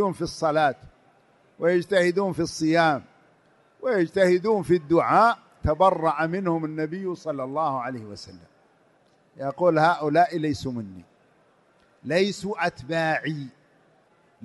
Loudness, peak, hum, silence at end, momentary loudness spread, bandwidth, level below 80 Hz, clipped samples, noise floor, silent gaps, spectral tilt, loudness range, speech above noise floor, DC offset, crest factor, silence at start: -24 LUFS; -6 dBFS; none; 0.95 s; 14 LU; 11.5 kHz; -50 dBFS; under 0.1%; -61 dBFS; none; -6 dB/octave; 7 LU; 38 dB; under 0.1%; 18 dB; 0 s